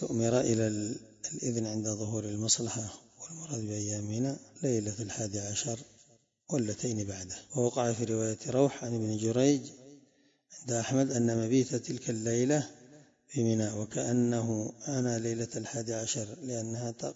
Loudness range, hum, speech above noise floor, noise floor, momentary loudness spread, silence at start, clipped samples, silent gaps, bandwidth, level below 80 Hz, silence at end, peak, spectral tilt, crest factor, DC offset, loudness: 4 LU; none; 35 dB; -67 dBFS; 10 LU; 0 s; under 0.1%; none; 8 kHz; -68 dBFS; 0 s; -14 dBFS; -5 dB/octave; 20 dB; under 0.1%; -32 LUFS